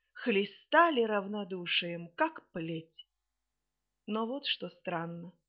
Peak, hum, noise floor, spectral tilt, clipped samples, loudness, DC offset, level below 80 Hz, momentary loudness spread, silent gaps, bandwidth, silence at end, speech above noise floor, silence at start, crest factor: -12 dBFS; none; -87 dBFS; -2 dB/octave; under 0.1%; -32 LUFS; under 0.1%; -80 dBFS; 14 LU; none; 5.6 kHz; 0.2 s; 54 dB; 0.15 s; 22 dB